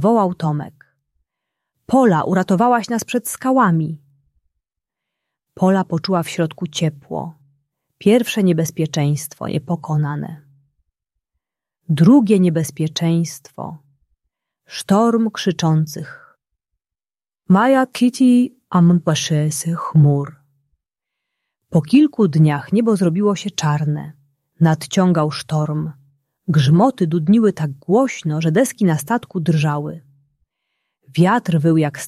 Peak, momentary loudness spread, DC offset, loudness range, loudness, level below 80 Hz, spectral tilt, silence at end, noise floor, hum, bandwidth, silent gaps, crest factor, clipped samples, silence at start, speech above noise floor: -2 dBFS; 13 LU; under 0.1%; 4 LU; -17 LUFS; -58 dBFS; -6.5 dB/octave; 0 s; under -90 dBFS; none; 14 kHz; none; 16 dB; under 0.1%; 0 s; over 74 dB